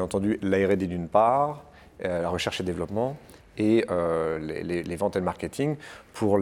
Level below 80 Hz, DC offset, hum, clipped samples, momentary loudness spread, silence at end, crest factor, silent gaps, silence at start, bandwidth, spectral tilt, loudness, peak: -54 dBFS; under 0.1%; none; under 0.1%; 9 LU; 0 s; 18 dB; none; 0 s; 14.5 kHz; -6.5 dB/octave; -27 LUFS; -8 dBFS